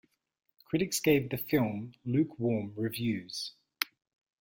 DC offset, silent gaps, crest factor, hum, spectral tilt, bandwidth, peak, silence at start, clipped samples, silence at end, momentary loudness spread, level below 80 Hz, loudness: under 0.1%; none; 24 dB; none; -5 dB/octave; 17 kHz; -8 dBFS; 0.7 s; under 0.1%; 0.55 s; 10 LU; -64 dBFS; -32 LUFS